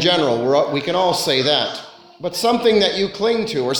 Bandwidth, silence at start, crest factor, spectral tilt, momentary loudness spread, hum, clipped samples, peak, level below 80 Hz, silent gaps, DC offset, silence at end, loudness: 19 kHz; 0 s; 16 dB; -4 dB/octave; 9 LU; none; under 0.1%; -2 dBFS; -54 dBFS; none; under 0.1%; 0 s; -17 LUFS